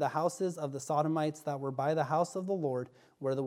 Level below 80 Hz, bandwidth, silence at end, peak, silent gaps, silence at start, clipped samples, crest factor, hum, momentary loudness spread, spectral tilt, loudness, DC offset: -82 dBFS; 16 kHz; 0 s; -16 dBFS; none; 0 s; under 0.1%; 16 dB; none; 8 LU; -6.5 dB/octave; -34 LUFS; under 0.1%